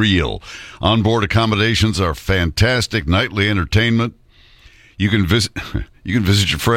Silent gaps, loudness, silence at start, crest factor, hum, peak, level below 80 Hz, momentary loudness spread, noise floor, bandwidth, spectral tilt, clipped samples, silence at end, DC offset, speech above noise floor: none; -17 LUFS; 0 s; 16 dB; none; 0 dBFS; -34 dBFS; 9 LU; -47 dBFS; 16.5 kHz; -5 dB/octave; under 0.1%; 0 s; under 0.1%; 30 dB